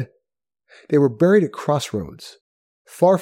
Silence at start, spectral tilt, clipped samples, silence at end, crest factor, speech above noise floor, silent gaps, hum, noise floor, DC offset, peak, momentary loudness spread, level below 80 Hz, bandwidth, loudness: 0 s; -7 dB/octave; under 0.1%; 0 s; 18 dB; 63 dB; 2.41-2.85 s; none; -81 dBFS; under 0.1%; -4 dBFS; 20 LU; -58 dBFS; 16 kHz; -19 LUFS